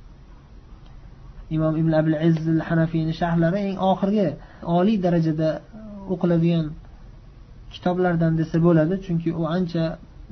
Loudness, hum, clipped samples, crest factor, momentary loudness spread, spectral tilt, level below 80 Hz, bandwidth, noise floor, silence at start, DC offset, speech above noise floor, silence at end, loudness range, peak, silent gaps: -22 LUFS; none; under 0.1%; 16 dB; 11 LU; -9.5 dB/octave; -44 dBFS; 6.2 kHz; -45 dBFS; 0 s; under 0.1%; 24 dB; 0.05 s; 3 LU; -6 dBFS; none